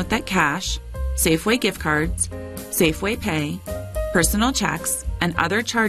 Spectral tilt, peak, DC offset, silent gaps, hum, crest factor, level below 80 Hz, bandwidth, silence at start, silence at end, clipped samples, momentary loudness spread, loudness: -3.5 dB/octave; -4 dBFS; under 0.1%; none; none; 16 dB; -32 dBFS; 14 kHz; 0 s; 0 s; under 0.1%; 9 LU; -21 LUFS